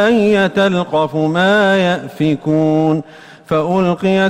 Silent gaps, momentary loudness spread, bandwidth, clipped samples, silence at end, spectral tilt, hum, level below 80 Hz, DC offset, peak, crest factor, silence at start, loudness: none; 6 LU; 11.5 kHz; under 0.1%; 0 s; -6.5 dB/octave; none; -50 dBFS; under 0.1%; -4 dBFS; 10 dB; 0 s; -14 LUFS